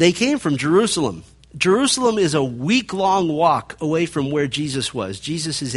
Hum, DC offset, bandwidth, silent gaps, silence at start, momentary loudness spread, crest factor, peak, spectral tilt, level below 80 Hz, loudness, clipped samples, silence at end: none; under 0.1%; 11.5 kHz; none; 0 s; 8 LU; 18 dB; 0 dBFS; -4.5 dB/octave; -52 dBFS; -19 LUFS; under 0.1%; 0 s